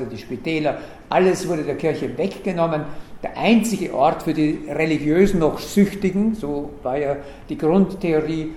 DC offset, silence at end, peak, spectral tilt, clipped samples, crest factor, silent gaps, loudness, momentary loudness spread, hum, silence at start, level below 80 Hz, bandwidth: under 0.1%; 0 s; -4 dBFS; -6.5 dB/octave; under 0.1%; 18 dB; none; -21 LUFS; 10 LU; none; 0 s; -42 dBFS; 15.5 kHz